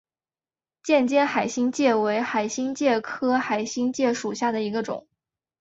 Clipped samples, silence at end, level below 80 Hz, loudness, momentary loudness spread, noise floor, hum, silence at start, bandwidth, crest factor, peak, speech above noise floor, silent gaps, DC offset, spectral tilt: under 0.1%; 0.6 s; -70 dBFS; -24 LUFS; 7 LU; under -90 dBFS; none; 0.85 s; 8 kHz; 16 dB; -8 dBFS; over 67 dB; none; under 0.1%; -4 dB/octave